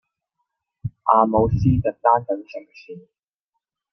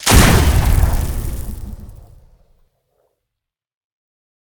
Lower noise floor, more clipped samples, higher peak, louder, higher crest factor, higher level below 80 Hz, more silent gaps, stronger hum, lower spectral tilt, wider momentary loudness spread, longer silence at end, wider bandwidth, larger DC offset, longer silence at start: about the same, -81 dBFS vs -82 dBFS; neither; about the same, -2 dBFS vs 0 dBFS; second, -19 LUFS vs -15 LUFS; about the same, 20 dB vs 18 dB; second, -40 dBFS vs -20 dBFS; neither; neither; first, -10 dB/octave vs -4.5 dB/octave; about the same, 21 LU vs 23 LU; second, 0.95 s vs 2.55 s; second, 6.2 kHz vs over 20 kHz; neither; first, 0.85 s vs 0 s